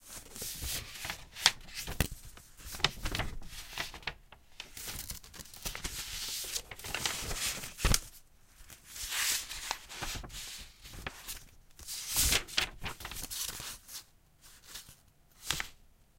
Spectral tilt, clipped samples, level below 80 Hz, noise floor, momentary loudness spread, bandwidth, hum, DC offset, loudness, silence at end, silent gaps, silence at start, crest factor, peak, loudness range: -1 dB/octave; under 0.1%; -46 dBFS; -62 dBFS; 19 LU; 17 kHz; none; under 0.1%; -35 LUFS; 0.35 s; none; 0 s; 36 dB; -2 dBFS; 6 LU